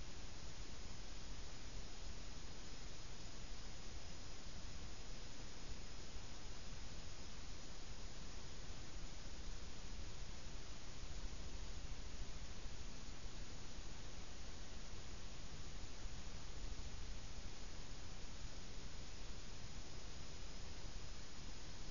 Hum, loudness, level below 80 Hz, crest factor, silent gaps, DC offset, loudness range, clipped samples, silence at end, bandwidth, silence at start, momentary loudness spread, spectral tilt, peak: none; -54 LUFS; -54 dBFS; 16 dB; none; 0.6%; 1 LU; under 0.1%; 0 s; 7.2 kHz; 0 s; 1 LU; -3.5 dB/octave; -32 dBFS